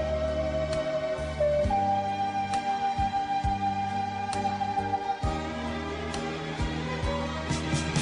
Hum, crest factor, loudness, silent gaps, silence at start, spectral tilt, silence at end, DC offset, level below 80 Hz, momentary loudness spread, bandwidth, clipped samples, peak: none; 14 dB; -29 LUFS; none; 0 s; -5.5 dB/octave; 0 s; under 0.1%; -40 dBFS; 6 LU; 10 kHz; under 0.1%; -14 dBFS